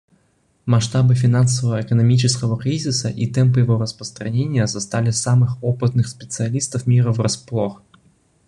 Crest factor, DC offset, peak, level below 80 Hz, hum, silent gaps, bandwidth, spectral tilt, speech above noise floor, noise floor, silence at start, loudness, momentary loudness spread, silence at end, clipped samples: 16 dB; under 0.1%; -2 dBFS; -48 dBFS; none; none; 11 kHz; -5.5 dB/octave; 44 dB; -62 dBFS; 0.65 s; -19 LUFS; 8 LU; 0.7 s; under 0.1%